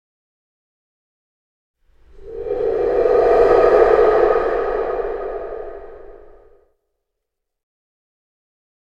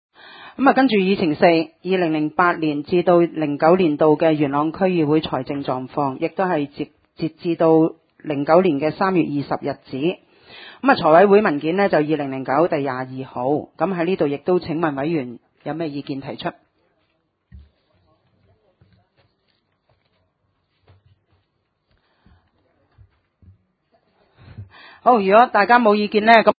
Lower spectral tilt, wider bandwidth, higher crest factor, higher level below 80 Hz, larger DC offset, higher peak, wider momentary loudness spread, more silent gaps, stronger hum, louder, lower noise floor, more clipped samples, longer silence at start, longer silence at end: second, -7 dB/octave vs -9 dB/octave; first, 6.8 kHz vs 5 kHz; about the same, 20 dB vs 20 dB; first, -40 dBFS vs -58 dBFS; neither; about the same, 0 dBFS vs 0 dBFS; first, 19 LU vs 15 LU; neither; neither; about the same, -16 LUFS vs -18 LUFS; first, -79 dBFS vs -70 dBFS; neither; first, 2.15 s vs 0.35 s; first, 2.75 s vs 0.1 s